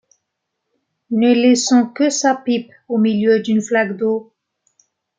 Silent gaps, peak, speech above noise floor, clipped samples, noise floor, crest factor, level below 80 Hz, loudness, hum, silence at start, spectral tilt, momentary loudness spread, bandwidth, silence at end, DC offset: none; -2 dBFS; 61 dB; under 0.1%; -76 dBFS; 16 dB; -66 dBFS; -16 LUFS; none; 1.1 s; -4 dB/octave; 9 LU; 9.4 kHz; 0.95 s; under 0.1%